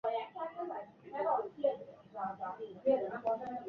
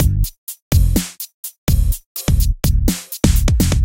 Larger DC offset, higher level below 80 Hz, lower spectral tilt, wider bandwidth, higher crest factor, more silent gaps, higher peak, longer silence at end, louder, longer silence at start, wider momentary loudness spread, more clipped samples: second, under 0.1% vs 0.6%; second, -78 dBFS vs -18 dBFS; about the same, -4 dB/octave vs -5 dB/octave; second, 5.6 kHz vs 17.5 kHz; about the same, 18 dB vs 16 dB; second, none vs 0.38-0.47 s, 0.62-0.71 s, 1.34-1.43 s, 1.58-1.67 s, 2.06-2.15 s; second, -20 dBFS vs 0 dBFS; about the same, 0 s vs 0 s; second, -38 LUFS vs -18 LUFS; about the same, 0.05 s vs 0 s; about the same, 12 LU vs 10 LU; neither